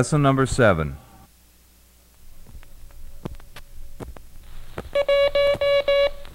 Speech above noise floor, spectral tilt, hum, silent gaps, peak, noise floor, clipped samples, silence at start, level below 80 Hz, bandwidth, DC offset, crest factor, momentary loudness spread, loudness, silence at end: 35 dB; -5.5 dB/octave; none; none; -4 dBFS; -54 dBFS; under 0.1%; 0 s; -38 dBFS; 16 kHz; under 0.1%; 18 dB; 22 LU; -20 LUFS; 0 s